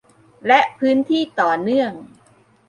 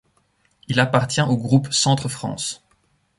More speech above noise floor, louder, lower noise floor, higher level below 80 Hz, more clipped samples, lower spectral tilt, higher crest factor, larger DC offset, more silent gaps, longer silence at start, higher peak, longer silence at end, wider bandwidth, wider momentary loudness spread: second, 37 dB vs 44 dB; about the same, -18 LUFS vs -20 LUFS; second, -54 dBFS vs -64 dBFS; second, -66 dBFS vs -54 dBFS; neither; about the same, -5.5 dB/octave vs -4.5 dB/octave; about the same, 18 dB vs 20 dB; neither; neither; second, 0.45 s vs 0.7 s; about the same, -2 dBFS vs -2 dBFS; about the same, 0.65 s vs 0.65 s; second, 10 kHz vs 11.5 kHz; about the same, 11 LU vs 10 LU